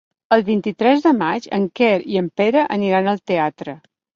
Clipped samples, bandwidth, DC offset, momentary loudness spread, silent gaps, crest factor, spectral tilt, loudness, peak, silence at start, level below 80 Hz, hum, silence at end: under 0.1%; 7.2 kHz; under 0.1%; 7 LU; none; 16 dB; -7 dB/octave; -18 LUFS; -2 dBFS; 0.3 s; -62 dBFS; none; 0.4 s